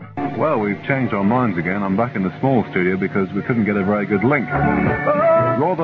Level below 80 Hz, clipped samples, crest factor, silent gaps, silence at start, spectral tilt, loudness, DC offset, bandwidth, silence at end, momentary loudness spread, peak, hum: -44 dBFS; under 0.1%; 14 dB; none; 0 s; -10 dB/octave; -18 LUFS; under 0.1%; 5.6 kHz; 0 s; 5 LU; -4 dBFS; none